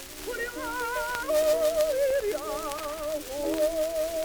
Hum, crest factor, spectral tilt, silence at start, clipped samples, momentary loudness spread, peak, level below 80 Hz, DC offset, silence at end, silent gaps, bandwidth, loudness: none; 18 dB; -2.5 dB/octave; 0 s; under 0.1%; 9 LU; -10 dBFS; -50 dBFS; under 0.1%; 0 s; none; over 20 kHz; -28 LUFS